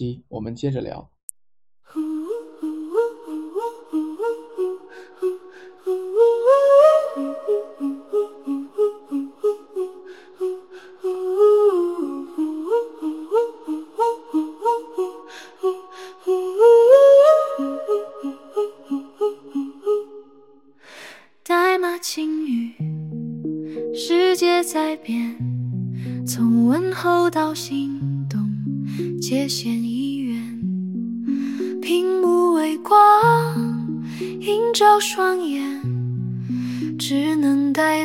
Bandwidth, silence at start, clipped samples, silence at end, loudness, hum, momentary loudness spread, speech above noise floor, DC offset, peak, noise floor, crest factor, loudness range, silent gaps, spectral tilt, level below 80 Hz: 16.5 kHz; 0 s; under 0.1%; 0 s; -20 LUFS; none; 15 LU; 27 dB; 0.1%; -2 dBFS; -51 dBFS; 18 dB; 11 LU; 1.23-1.28 s; -5.5 dB/octave; -64 dBFS